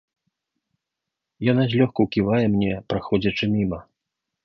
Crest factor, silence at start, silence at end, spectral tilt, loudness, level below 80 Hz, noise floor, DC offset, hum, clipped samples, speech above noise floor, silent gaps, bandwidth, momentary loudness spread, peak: 18 dB; 1.4 s; 0.65 s; -8.5 dB/octave; -22 LUFS; -50 dBFS; -84 dBFS; under 0.1%; none; under 0.1%; 63 dB; none; 6.4 kHz; 7 LU; -4 dBFS